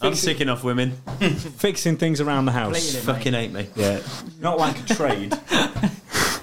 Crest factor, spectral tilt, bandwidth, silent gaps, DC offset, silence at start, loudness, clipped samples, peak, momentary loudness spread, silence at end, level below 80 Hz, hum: 18 dB; -4.5 dB/octave; 17 kHz; none; 0.9%; 0 s; -23 LUFS; under 0.1%; -4 dBFS; 5 LU; 0 s; -50 dBFS; none